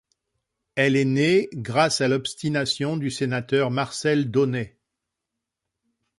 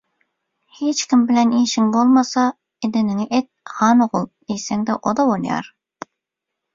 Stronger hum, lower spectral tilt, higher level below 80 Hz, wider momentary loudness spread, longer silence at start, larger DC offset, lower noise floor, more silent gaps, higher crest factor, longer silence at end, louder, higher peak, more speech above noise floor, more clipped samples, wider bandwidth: neither; about the same, -5 dB/octave vs -4.5 dB/octave; about the same, -62 dBFS vs -62 dBFS; second, 6 LU vs 12 LU; about the same, 0.75 s vs 0.8 s; neither; about the same, -84 dBFS vs -82 dBFS; neither; about the same, 18 dB vs 16 dB; first, 1.5 s vs 1.1 s; second, -23 LUFS vs -18 LUFS; second, -6 dBFS vs -2 dBFS; about the same, 62 dB vs 64 dB; neither; first, 11.5 kHz vs 7.6 kHz